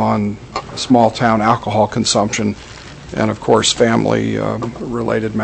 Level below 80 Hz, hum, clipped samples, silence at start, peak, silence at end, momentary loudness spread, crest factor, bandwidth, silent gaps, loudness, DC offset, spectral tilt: -42 dBFS; none; under 0.1%; 0 s; 0 dBFS; 0 s; 13 LU; 16 dB; 8.6 kHz; none; -16 LUFS; under 0.1%; -4.5 dB/octave